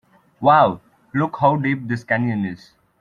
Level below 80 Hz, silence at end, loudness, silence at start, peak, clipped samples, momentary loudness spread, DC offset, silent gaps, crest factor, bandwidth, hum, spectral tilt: -60 dBFS; 0.45 s; -19 LUFS; 0.4 s; -2 dBFS; under 0.1%; 13 LU; under 0.1%; none; 18 dB; 9.6 kHz; none; -8.5 dB/octave